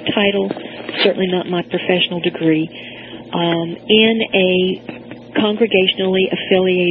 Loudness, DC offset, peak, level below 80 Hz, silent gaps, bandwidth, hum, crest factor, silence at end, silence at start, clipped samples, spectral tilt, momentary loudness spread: -16 LUFS; under 0.1%; 0 dBFS; -56 dBFS; none; 5 kHz; none; 16 dB; 0 s; 0 s; under 0.1%; -9.5 dB/octave; 13 LU